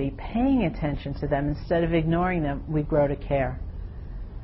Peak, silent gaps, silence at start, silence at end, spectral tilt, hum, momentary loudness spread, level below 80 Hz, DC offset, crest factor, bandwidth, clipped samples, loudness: -10 dBFS; none; 0 s; 0 s; -7 dB/octave; none; 15 LU; -36 dBFS; under 0.1%; 14 dB; 5.8 kHz; under 0.1%; -26 LUFS